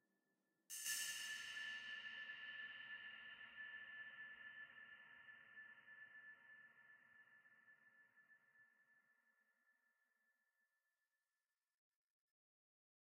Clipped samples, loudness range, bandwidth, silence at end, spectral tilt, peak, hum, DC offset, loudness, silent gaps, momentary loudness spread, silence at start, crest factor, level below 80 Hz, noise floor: under 0.1%; 16 LU; 15.5 kHz; 3.3 s; 2.5 dB/octave; -32 dBFS; none; under 0.1%; -52 LUFS; none; 22 LU; 0.7 s; 26 dB; under -90 dBFS; under -90 dBFS